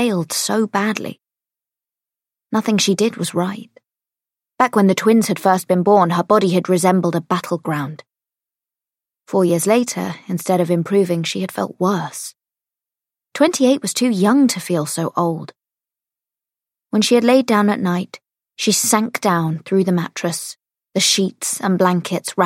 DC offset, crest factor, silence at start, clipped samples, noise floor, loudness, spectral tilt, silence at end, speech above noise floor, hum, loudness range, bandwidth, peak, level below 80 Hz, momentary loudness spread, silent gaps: under 0.1%; 18 dB; 0 s; under 0.1%; -89 dBFS; -17 LUFS; -4.5 dB/octave; 0 s; 72 dB; none; 5 LU; 16.5 kHz; 0 dBFS; -68 dBFS; 10 LU; none